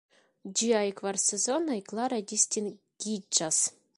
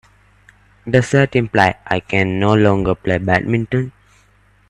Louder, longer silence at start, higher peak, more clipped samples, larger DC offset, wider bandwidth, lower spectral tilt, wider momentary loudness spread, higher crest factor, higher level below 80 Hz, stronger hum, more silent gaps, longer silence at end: second, -28 LUFS vs -16 LUFS; second, 0.45 s vs 0.85 s; second, -8 dBFS vs 0 dBFS; neither; neither; about the same, 11.5 kHz vs 11 kHz; second, -2 dB/octave vs -7 dB/octave; about the same, 10 LU vs 8 LU; first, 22 dB vs 16 dB; second, -78 dBFS vs -44 dBFS; second, none vs 50 Hz at -35 dBFS; neither; second, 0.25 s vs 0.8 s